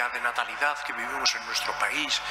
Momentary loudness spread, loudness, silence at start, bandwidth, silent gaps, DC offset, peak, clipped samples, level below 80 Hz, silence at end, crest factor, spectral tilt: 4 LU; -27 LUFS; 0 s; 16 kHz; none; under 0.1%; -8 dBFS; under 0.1%; -60 dBFS; 0 s; 22 dB; 0.5 dB/octave